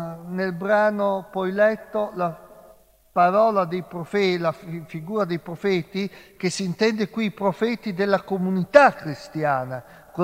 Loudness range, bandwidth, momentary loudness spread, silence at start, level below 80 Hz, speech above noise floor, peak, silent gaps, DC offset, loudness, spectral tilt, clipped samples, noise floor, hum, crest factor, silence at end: 4 LU; 16 kHz; 14 LU; 0 s; -62 dBFS; 31 dB; 0 dBFS; none; under 0.1%; -23 LUFS; -6 dB/octave; under 0.1%; -53 dBFS; none; 22 dB; 0 s